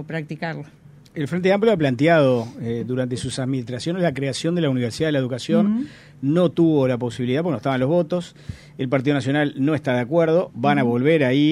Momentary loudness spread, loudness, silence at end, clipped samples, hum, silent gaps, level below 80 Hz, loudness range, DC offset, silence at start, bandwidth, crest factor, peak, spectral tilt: 12 LU; -21 LUFS; 0 s; under 0.1%; none; none; -56 dBFS; 2 LU; under 0.1%; 0 s; 12.5 kHz; 16 dB; -4 dBFS; -7 dB/octave